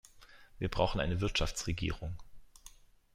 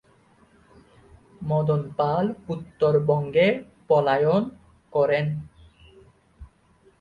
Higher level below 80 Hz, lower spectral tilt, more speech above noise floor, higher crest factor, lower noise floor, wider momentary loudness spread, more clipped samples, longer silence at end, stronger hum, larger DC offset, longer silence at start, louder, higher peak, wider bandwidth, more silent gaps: first, -44 dBFS vs -56 dBFS; second, -4.5 dB/octave vs -8.5 dB/octave; second, 24 dB vs 37 dB; about the same, 22 dB vs 18 dB; about the same, -57 dBFS vs -59 dBFS; first, 23 LU vs 13 LU; neither; about the same, 0.45 s vs 0.55 s; neither; neither; second, 0.15 s vs 1.4 s; second, -35 LUFS vs -23 LUFS; second, -14 dBFS vs -8 dBFS; first, 15.5 kHz vs 6.8 kHz; neither